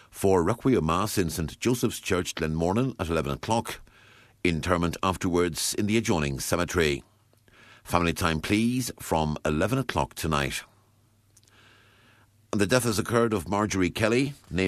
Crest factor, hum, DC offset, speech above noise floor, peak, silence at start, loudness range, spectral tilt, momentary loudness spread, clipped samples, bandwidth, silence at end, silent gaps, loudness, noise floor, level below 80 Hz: 22 dB; none; under 0.1%; 37 dB; -6 dBFS; 0.15 s; 3 LU; -5 dB/octave; 5 LU; under 0.1%; 14 kHz; 0 s; none; -26 LUFS; -63 dBFS; -46 dBFS